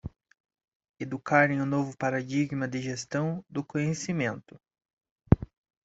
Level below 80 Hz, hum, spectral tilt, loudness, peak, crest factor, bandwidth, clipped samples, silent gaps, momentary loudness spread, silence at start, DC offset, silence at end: -46 dBFS; none; -6.5 dB/octave; -29 LUFS; -4 dBFS; 26 dB; 8 kHz; under 0.1%; 0.40-0.44 s, 0.64-0.68 s, 0.75-0.80 s, 0.89-0.94 s, 4.93-4.97 s, 5.11-5.16 s; 14 LU; 0.05 s; under 0.1%; 0.4 s